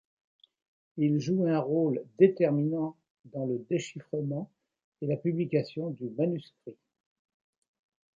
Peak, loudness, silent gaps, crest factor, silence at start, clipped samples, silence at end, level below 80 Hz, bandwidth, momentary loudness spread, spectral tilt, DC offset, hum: -8 dBFS; -30 LUFS; 3.10-3.24 s, 4.84-4.92 s; 22 dB; 0.95 s; under 0.1%; 1.45 s; -76 dBFS; 7.6 kHz; 15 LU; -8 dB/octave; under 0.1%; none